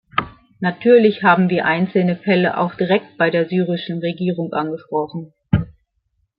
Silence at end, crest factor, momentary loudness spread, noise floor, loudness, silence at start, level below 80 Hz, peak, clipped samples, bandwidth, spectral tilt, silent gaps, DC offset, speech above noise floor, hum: 0.7 s; 16 dB; 11 LU; -68 dBFS; -18 LUFS; 0.15 s; -46 dBFS; -2 dBFS; under 0.1%; 5.2 kHz; -11.5 dB/octave; none; under 0.1%; 51 dB; none